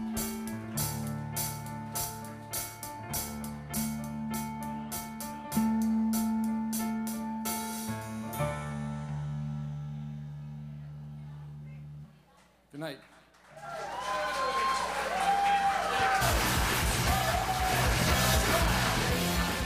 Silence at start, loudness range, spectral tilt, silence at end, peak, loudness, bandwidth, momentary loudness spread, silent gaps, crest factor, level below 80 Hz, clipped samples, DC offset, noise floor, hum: 0 s; 15 LU; -4 dB/octave; 0 s; -14 dBFS; -31 LUFS; 15.5 kHz; 16 LU; none; 18 dB; -42 dBFS; under 0.1%; under 0.1%; -62 dBFS; none